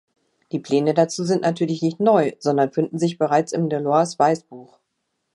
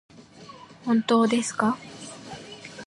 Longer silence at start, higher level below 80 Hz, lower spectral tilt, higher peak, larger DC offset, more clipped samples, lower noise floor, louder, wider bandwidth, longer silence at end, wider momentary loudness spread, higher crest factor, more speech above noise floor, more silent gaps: first, 0.55 s vs 0.2 s; about the same, -72 dBFS vs -68 dBFS; first, -6 dB/octave vs -4.5 dB/octave; about the same, -4 dBFS vs -6 dBFS; neither; neither; first, -75 dBFS vs -47 dBFS; first, -20 LUFS vs -24 LUFS; about the same, 11.5 kHz vs 11.5 kHz; first, 0.7 s vs 0 s; second, 5 LU vs 23 LU; about the same, 18 dB vs 20 dB; first, 55 dB vs 24 dB; neither